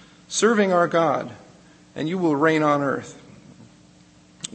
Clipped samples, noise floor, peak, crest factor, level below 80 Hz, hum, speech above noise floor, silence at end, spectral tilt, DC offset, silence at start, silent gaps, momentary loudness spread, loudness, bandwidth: under 0.1%; -52 dBFS; -6 dBFS; 18 dB; -66 dBFS; none; 32 dB; 0.1 s; -4.5 dB/octave; under 0.1%; 0.3 s; none; 18 LU; -21 LUFS; 8.8 kHz